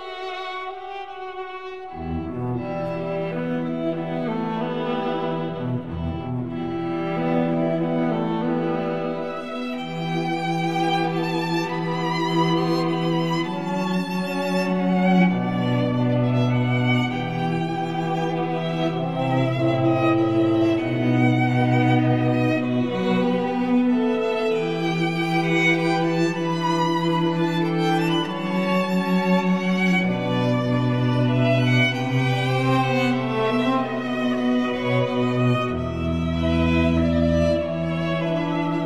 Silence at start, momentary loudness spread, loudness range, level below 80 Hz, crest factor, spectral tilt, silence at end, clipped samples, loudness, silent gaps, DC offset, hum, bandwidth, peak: 0 s; 8 LU; 6 LU; -46 dBFS; 16 dB; -7 dB/octave; 0 s; under 0.1%; -22 LUFS; none; 0.4%; none; 12.5 kHz; -6 dBFS